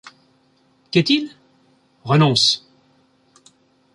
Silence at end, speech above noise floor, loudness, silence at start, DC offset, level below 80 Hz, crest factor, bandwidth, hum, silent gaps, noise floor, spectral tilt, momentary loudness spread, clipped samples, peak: 1.35 s; 43 dB; -17 LUFS; 0.05 s; under 0.1%; -64 dBFS; 20 dB; 11.5 kHz; none; none; -59 dBFS; -4.5 dB/octave; 16 LU; under 0.1%; -2 dBFS